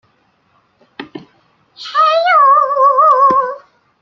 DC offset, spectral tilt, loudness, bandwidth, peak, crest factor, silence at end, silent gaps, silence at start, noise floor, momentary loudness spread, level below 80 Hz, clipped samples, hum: under 0.1%; -3.5 dB/octave; -10 LUFS; 6.8 kHz; -2 dBFS; 12 dB; 0.45 s; none; 1 s; -57 dBFS; 23 LU; -64 dBFS; under 0.1%; none